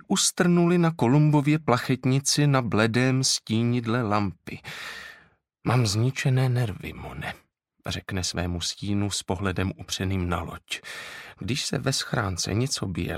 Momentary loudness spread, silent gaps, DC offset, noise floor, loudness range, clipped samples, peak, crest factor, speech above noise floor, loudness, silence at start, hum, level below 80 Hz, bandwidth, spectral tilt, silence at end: 15 LU; none; under 0.1%; -58 dBFS; 7 LU; under 0.1%; -4 dBFS; 20 dB; 34 dB; -25 LUFS; 0.1 s; none; -50 dBFS; 15.5 kHz; -5 dB/octave; 0 s